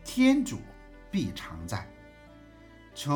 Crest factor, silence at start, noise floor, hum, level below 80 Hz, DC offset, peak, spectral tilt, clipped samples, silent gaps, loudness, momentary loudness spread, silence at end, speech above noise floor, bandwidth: 20 dB; 0 s; -52 dBFS; none; -54 dBFS; under 0.1%; -12 dBFS; -5.5 dB/octave; under 0.1%; none; -30 LUFS; 24 LU; 0 s; 25 dB; 19.5 kHz